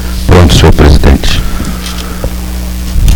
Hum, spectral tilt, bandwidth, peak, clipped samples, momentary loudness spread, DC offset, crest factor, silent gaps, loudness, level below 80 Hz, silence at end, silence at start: none; -5.5 dB/octave; 19.5 kHz; 0 dBFS; 2%; 13 LU; under 0.1%; 6 dB; none; -8 LUFS; -10 dBFS; 0 s; 0 s